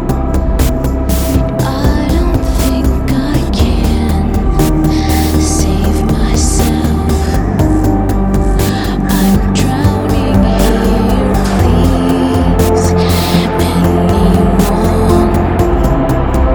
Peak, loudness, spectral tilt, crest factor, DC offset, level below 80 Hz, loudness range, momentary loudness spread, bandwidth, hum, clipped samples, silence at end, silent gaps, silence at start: 0 dBFS; -12 LUFS; -6.5 dB/octave; 10 dB; under 0.1%; -16 dBFS; 2 LU; 3 LU; over 20 kHz; none; under 0.1%; 0 s; none; 0 s